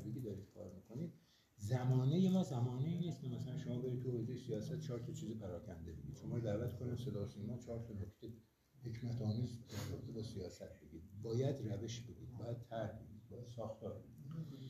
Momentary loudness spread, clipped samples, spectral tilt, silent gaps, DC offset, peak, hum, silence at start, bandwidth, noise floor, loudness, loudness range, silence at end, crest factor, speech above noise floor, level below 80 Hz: 16 LU; under 0.1%; -7.5 dB/octave; none; under 0.1%; -26 dBFS; none; 0 s; 14 kHz; -67 dBFS; -44 LUFS; 7 LU; 0 s; 18 dB; 25 dB; -68 dBFS